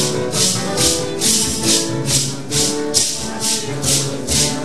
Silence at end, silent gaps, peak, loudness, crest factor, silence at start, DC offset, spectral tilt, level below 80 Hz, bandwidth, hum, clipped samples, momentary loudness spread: 0 s; none; 0 dBFS; -16 LUFS; 18 dB; 0 s; 3%; -2.5 dB/octave; -40 dBFS; 13.5 kHz; none; under 0.1%; 4 LU